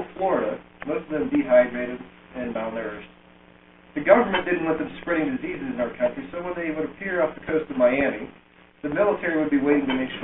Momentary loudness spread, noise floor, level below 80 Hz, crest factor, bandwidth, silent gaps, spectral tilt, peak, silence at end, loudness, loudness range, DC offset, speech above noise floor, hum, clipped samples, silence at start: 15 LU; -52 dBFS; -54 dBFS; 22 dB; 3.9 kHz; none; -10 dB/octave; -2 dBFS; 0 s; -24 LUFS; 2 LU; under 0.1%; 28 dB; none; under 0.1%; 0 s